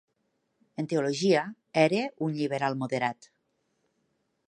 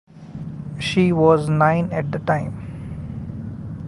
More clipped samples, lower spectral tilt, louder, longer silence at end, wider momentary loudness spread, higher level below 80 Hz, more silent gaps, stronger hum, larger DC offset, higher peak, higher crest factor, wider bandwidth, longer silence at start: neither; second, -5.5 dB/octave vs -7.5 dB/octave; second, -28 LUFS vs -19 LUFS; first, 1.35 s vs 0 s; second, 9 LU vs 17 LU; second, -78 dBFS vs -44 dBFS; neither; neither; neither; second, -8 dBFS vs -2 dBFS; about the same, 22 dB vs 18 dB; about the same, 11.5 kHz vs 11.5 kHz; first, 0.8 s vs 0.15 s